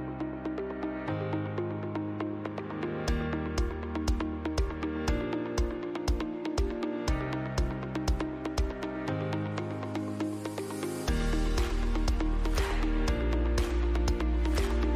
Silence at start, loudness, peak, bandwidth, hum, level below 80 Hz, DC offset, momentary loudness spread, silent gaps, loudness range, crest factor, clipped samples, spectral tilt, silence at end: 0 s; -33 LUFS; -18 dBFS; 15 kHz; none; -34 dBFS; under 0.1%; 5 LU; none; 3 LU; 12 dB; under 0.1%; -6 dB/octave; 0 s